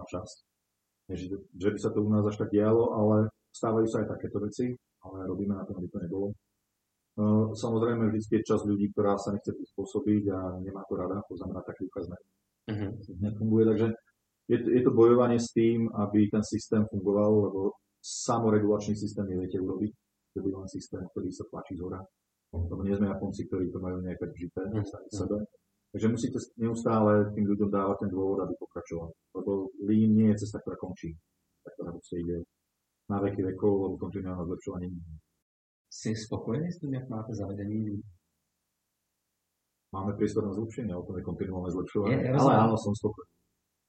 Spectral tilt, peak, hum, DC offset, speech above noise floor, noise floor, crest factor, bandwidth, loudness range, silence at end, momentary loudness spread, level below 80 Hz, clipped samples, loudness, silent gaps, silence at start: -7.5 dB/octave; -8 dBFS; none; under 0.1%; 53 dB; -82 dBFS; 22 dB; 9 kHz; 10 LU; 0.65 s; 15 LU; -58 dBFS; under 0.1%; -30 LUFS; 35.42-35.85 s; 0 s